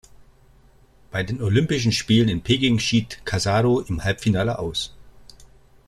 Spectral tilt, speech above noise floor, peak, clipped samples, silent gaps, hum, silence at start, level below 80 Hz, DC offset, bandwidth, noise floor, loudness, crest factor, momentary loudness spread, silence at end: -5.5 dB/octave; 32 dB; -4 dBFS; under 0.1%; none; none; 1.15 s; -44 dBFS; under 0.1%; 13 kHz; -53 dBFS; -21 LUFS; 18 dB; 9 LU; 0.4 s